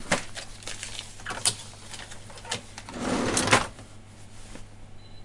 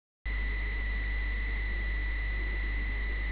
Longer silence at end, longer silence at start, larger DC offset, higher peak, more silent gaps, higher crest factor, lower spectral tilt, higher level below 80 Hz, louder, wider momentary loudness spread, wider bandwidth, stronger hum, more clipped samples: about the same, 0 s vs 0 s; second, 0 s vs 0.25 s; second, under 0.1% vs 0.4%; first, -4 dBFS vs -24 dBFS; neither; first, 26 dB vs 8 dB; second, -2.5 dB/octave vs -4 dB/octave; second, -48 dBFS vs -32 dBFS; first, -28 LUFS vs -34 LUFS; first, 25 LU vs 1 LU; first, 11.5 kHz vs 4 kHz; neither; neither